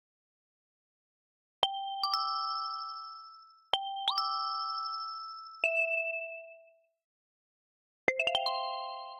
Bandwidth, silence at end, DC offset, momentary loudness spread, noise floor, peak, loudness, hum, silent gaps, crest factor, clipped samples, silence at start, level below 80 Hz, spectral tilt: 16 kHz; 0 s; under 0.1%; 14 LU; -62 dBFS; -12 dBFS; -33 LUFS; none; 7.04-8.07 s; 24 dB; under 0.1%; 1.6 s; -78 dBFS; -1 dB/octave